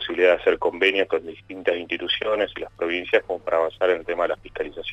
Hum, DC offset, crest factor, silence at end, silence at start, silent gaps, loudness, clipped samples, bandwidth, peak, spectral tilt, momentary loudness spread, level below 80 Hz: none; under 0.1%; 20 dB; 0 s; 0 s; none; -23 LUFS; under 0.1%; 8 kHz; -4 dBFS; -4.5 dB/octave; 9 LU; -54 dBFS